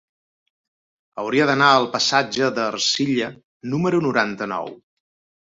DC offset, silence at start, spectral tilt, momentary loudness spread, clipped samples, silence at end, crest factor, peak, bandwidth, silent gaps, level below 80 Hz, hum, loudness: under 0.1%; 1.15 s; -4 dB/octave; 15 LU; under 0.1%; 0.65 s; 20 dB; -2 dBFS; 8 kHz; 3.44-3.60 s; -64 dBFS; none; -19 LUFS